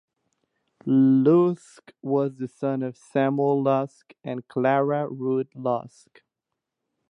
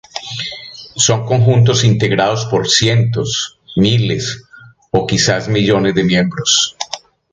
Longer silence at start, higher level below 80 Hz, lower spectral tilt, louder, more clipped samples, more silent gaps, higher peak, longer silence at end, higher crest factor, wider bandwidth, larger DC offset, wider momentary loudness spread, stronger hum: first, 0.85 s vs 0.15 s; second, -76 dBFS vs -44 dBFS; first, -9 dB/octave vs -4 dB/octave; second, -23 LUFS vs -14 LUFS; neither; neither; second, -8 dBFS vs 0 dBFS; first, 1.25 s vs 0.35 s; about the same, 16 dB vs 14 dB; about the same, 9.8 kHz vs 9.6 kHz; neither; first, 16 LU vs 13 LU; neither